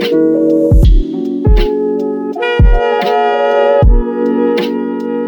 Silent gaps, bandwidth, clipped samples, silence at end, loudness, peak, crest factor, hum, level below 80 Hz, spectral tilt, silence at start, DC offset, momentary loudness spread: none; 17.5 kHz; under 0.1%; 0 s; -12 LUFS; 0 dBFS; 10 dB; none; -14 dBFS; -8.5 dB/octave; 0 s; under 0.1%; 7 LU